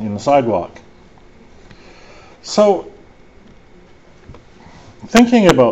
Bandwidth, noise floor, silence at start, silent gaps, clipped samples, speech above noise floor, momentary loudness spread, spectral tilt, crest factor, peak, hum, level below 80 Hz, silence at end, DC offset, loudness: 8.2 kHz; -45 dBFS; 0 s; none; under 0.1%; 33 dB; 22 LU; -5.5 dB/octave; 18 dB; 0 dBFS; none; -44 dBFS; 0 s; 0.4%; -14 LUFS